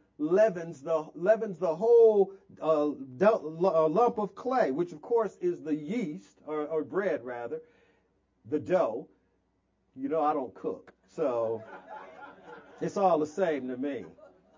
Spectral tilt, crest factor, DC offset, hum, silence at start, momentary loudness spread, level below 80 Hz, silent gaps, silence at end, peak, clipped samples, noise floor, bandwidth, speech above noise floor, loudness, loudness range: -7.5 dB/octave; 20 dB; under 0.1%; none; 0.2 s; 16 LU; -76 dBFS; none; 0.45 s; -10 dBFS; under 0.1%; -74 dBFS; 7.6 kHz; 46 dB; -29 LUFS; 8 LU